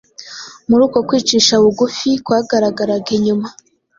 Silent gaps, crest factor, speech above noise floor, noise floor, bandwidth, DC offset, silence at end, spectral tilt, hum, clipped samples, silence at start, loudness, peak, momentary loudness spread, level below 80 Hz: none; 16 dB; 20 dB; -34 dBFS; 7.6 kHz; under 0.1%; 0.45 s; -4 dB/octave; none; under 0.1%; 0.2 s; -14 LUFS; 0 dBFS; 18 LU; -54 dBFS